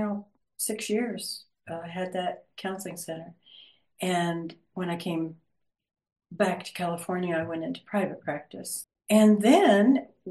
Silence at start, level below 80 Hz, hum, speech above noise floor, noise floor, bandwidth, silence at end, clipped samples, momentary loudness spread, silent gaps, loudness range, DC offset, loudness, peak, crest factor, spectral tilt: 0 s; -74 dBFS; none; 29 dB; -55 dBFS; 12.5 kHz; 0 s; under 0.1%; 18 LU; none; 10 LU; under 0.1%; -27 LUFS; -8 dBFS; 20 dB; -5 dB/octave